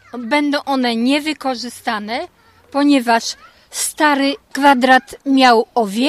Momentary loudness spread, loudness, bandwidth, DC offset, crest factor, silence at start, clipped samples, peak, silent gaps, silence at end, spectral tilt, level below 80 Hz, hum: 13 LU; -16 LUFS; 15.5 kHz; under 0.1%; 16 dB; 0.15 s; under 0.1%; 0 dBFS; none; 0 s; -2.5 dB/octave; -58 dBFS; none